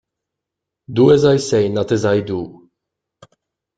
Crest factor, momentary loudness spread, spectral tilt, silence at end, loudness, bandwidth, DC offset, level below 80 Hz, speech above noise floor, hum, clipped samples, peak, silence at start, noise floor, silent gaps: 16 dB; 14 LU; -6.5 dB/octave; 1.25 s; -16 LUFS; 9.2 kHz; under 0.1%; -54 dBFS; 68 dB; none; under 0.1%; -2 dBFS; 0.9 s; -82 dBFS; none